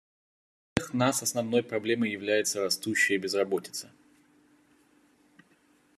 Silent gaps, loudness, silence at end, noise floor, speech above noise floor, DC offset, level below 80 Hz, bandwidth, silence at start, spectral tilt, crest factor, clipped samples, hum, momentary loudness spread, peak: none; -28 LUFS; 2.1 s; -65 dBFS; 36 dB; under 0.1%; -66 dBFS; 14 kHz; 0.75 s; -3.5 dB/octave; 28 dB; under 0.1%; none; 8 LU; -4 dBFS